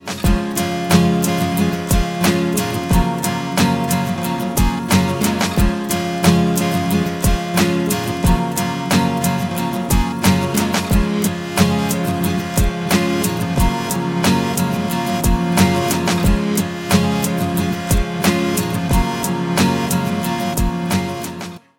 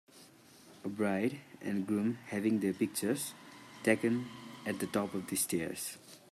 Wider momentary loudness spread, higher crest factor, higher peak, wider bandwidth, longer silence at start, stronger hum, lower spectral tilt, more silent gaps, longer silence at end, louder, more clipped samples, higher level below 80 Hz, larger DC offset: second, 5 LU vs 12 LU; about the same, 18 dB vs 22 dB; first, 0 dBFS vs -14 dBFS; first, 17 kHz vs 15 kHz; second, 0 s vs 0.15 s; neither; about the same, -5 dB/octave vs -4.5 dB/octave; neither; about the same, 0.2 s vs 0.15 s; first, -18 LUFS vs -35 LUFS; neither; first, -26 dBFS vs -78 dBFS; neither